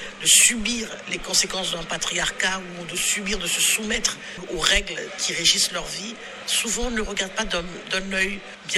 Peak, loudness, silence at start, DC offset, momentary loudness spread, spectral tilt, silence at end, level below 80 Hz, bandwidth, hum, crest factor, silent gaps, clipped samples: -2 dBFS; -21 LUFS; 0 s; under 0.1%; 13 LU; -0.5 dB/octave; 0 s; -42 dBFS; 15.5 kHz; none; 22 dB; none; under 0.1%